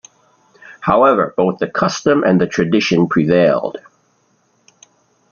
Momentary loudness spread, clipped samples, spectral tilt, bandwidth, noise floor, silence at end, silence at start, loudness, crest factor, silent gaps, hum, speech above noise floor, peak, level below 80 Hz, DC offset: 7 LU; under 0.1%; -6 dB/octave; 7 kHz; -60 dBFS; 1.5 s; 0.65 s; -15 LUFS; 16 dB; none; none; 46 dB; -2 dBFS; -52 dBFS; under 0.1%